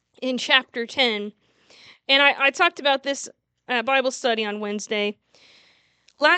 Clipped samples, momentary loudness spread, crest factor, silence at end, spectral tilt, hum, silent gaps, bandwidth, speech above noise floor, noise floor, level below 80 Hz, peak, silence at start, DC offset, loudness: under 0.1%; 13 LU; 24 dB; 0 s; -2 dB/octave; none; none; 9.2 kHz; 38 dB; -61 dBFS; -80 dBFS; 0 dBFS; 0.2 s; under 0.1%; -21 LUFS